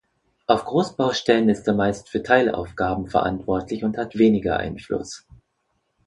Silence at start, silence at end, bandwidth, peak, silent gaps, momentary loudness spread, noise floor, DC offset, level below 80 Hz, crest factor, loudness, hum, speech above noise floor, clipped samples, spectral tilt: 0.5 s; 0.9 s; 11 kHz; 0 dBFS; none; 10 LU; -72 dBFS; under 0.1%; -48 dBFS; 22 dB; -22 LUFS; none; 51 dB; under 0.1%; -6 dB/octave